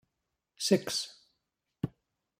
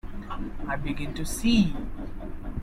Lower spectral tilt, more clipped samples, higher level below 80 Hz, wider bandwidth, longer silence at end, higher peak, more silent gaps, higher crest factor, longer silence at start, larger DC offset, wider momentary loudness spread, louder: about the same, -4 dB/octave vs -5 dB/octave; neither; second, -68 dBFS vs -36 dBFS; about the same, 16 kHz vs 15 kHz; first, 0.5 s vs 0 s; about the same, -12 dBFS vs -10 dBFS; neither; first, 24 dB vs 18 dB; first, 0.6 s vs 0.05 s; neither; second, 12 LU vs 16 LU; second, -33 LUFS vs -29 LUFS